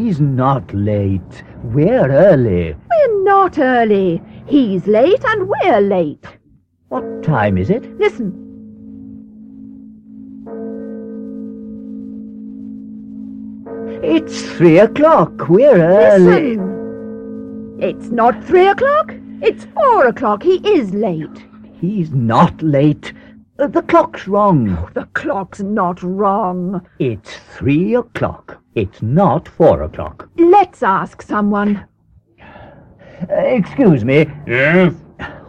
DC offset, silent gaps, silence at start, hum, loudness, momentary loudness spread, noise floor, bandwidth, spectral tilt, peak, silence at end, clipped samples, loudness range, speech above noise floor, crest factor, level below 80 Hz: under 0.1%; none; 0 s; none; -14 LUFS; 20 LU; -53 dBFS; 8.8 kHz; -8 dB/octave; 0 dBFS; 0.1 s; under 0.1%; 13 LU; 40 dB; 14 dB; -44 dBFS